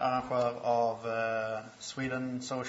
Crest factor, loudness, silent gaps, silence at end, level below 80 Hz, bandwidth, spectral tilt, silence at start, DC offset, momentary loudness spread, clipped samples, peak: 14 dB; -33 LUFS; none; 0 s; -66 dBFS; 8 kHz; -5 dB/octave; 0 s; under 0.1%; 8 LU; under 0.1%; -18 dBFS